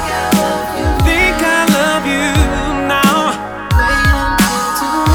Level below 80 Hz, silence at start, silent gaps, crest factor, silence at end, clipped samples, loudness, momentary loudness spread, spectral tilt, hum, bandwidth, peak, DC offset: -22 dBFS; 0 s; none; 12 dB; 0 s; under 0.1%; -13 LUFS; 5 LU; -4.5 dB/octave; none; over 20 kHz; 0 dBFS; under 0.1%